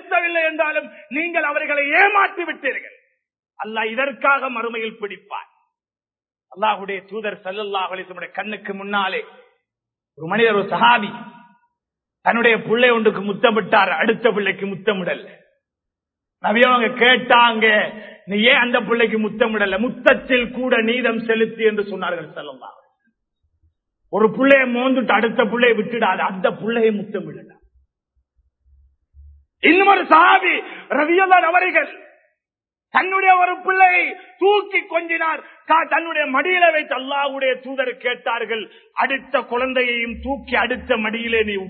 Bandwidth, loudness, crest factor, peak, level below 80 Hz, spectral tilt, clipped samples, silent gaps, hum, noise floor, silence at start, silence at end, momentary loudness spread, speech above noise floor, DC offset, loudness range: 4.5 kHz; -17 LUFS; 20 dB; 0 dBFS; -54 dBFS; -7.5 dB/octave; under 0.1%; none; none; under -90 dBFS; 0.05 s; 0 s; 14 LU; over 72 dB; under 0.1%; 9 LU